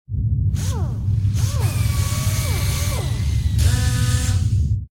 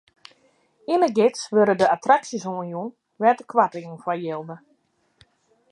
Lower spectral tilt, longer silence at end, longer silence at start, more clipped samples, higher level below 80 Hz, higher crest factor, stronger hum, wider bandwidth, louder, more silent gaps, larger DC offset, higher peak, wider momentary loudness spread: about the same, -5 dB/octave vs -5 dB/octave; second, 0.05 s vs 1.15 s; second, 0.1 s vs 0.9 s; neither; first, -26 dBFS vs -72 dBFS; second, 14 dB vs 20 dB; neither; first, 17 kHz vs 11.5 kHz; about the same, -21 LUFS vs -22 LUFS; neither; neither; second, -6 dBFS vs -2 dBFS; second, 4 LU vs 15 LU